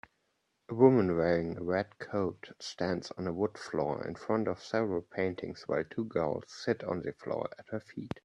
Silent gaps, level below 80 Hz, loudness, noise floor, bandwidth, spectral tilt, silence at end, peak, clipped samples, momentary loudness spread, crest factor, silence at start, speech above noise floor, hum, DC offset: none; -66 dBFS; -33 LUFS; -78 dBFS; 10 kHz; -7 dB/octave; 0.15 s; -12 dBFS; under 0.1%; 13 LU; 22 dB; 0.7 s; 46 dB; none; under 0.1%